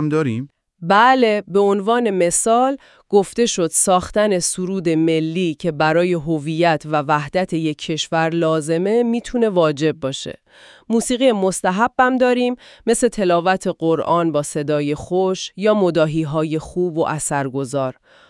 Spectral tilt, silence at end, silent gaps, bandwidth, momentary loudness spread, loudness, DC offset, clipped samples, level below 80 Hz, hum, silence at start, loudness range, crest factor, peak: -4.5 dB/octave; 0.4 s; none; 12 kHz; 7 LU; -18 LUFS; under 0.1%; under 0.1%; -50 dBFS; none; 0 s; 3 LU; 18 dB; 0 dBFS